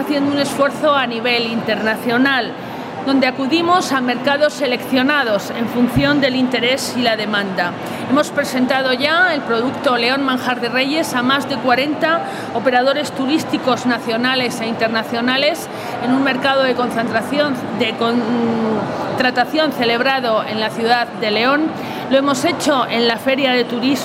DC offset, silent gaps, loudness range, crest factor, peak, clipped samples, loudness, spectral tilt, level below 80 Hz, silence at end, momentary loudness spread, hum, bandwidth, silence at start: under 0.1%; none; 1 LU; 14 dB; -2 dBFS; under 0.1%; -16 LUFS; -4 dB/octave; -52 dBFS; 0 s; 5 LU; none; 16 kHz; 0 s